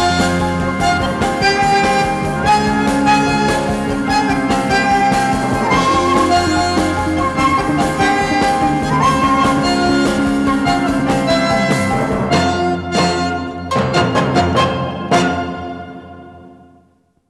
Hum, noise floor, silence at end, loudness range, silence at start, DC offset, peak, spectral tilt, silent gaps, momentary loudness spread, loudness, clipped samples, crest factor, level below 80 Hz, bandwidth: none; -55 dBFS; 0.75 s; 2 LU; 0 s; under 0.1%; -2 dBFS; -5 dB/octave; none; 5 LU; -15 LUFS; under 0.1%; 12 dB; -34 dBFS; 13.5 kHz